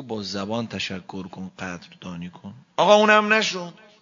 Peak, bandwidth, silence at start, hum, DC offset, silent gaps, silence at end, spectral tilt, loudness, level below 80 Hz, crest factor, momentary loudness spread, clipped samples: -2 dBFS; 7.6 kHz; 0 s; none; under 0.1%; none; 0.3 s; -4 dB/octave; -20 LUFS; -66 dBFS; 22 dB; 21 LU; under 0.1%